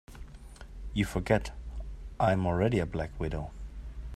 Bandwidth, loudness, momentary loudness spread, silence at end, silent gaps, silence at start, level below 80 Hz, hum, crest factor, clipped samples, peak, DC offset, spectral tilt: 13.5 kHz; -31 LUFS; 22 LU; 0 s; none; 0.1 s; -42 dBFS; none; 22 dB; under 0.1%; -10 dBFS; under 0.1%; -7 dB/octave